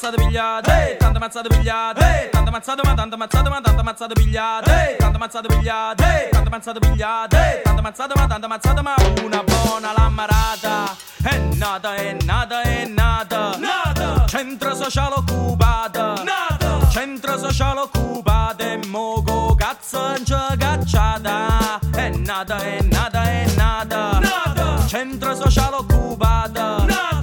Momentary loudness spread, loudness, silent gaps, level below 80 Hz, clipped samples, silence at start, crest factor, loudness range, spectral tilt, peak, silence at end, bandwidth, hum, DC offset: 6 LU; -19 LUFS; none; -22 dBFS; under 0.1%; 0 s; 16 dB; 2 LU; -5 dB/octave; -2 dBFS; 0 s; 17.5 kHz; none; under 0.1%